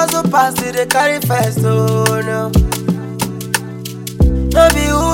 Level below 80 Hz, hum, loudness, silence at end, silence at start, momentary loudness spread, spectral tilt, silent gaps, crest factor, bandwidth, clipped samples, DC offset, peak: -22 dBFS; none; -14 LUFS; 0 s; 0 s; 10 LU; -5 dB/octave; none; 14 dB; 17 kHz; under 0.1%; under 0.1%; 0 dBFS